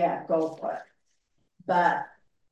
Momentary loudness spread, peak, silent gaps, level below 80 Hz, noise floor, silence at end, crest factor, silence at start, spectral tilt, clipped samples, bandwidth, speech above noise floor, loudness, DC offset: 17 LU; -10 dBFS; none; -78 dBFS; -75 dBFS; 0.45 s; 20 dB; 0 s; -6.5 dB/octave; under 0.1%; 8.6 kHz; 48 dB; -27 LUFS; under 0.1%